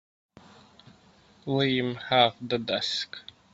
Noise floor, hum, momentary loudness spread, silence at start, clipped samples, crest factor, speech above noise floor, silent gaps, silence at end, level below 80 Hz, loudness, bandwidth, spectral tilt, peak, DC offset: -58 dBFS; none; 15 LU; 1.45 s; under 0.1%; 24 dB; 32 dB; none; 0.35 s; -66 dBFS; -26 LUFS; 8 kHz; -5 dB/octave; -6 dBFS; under 0.1%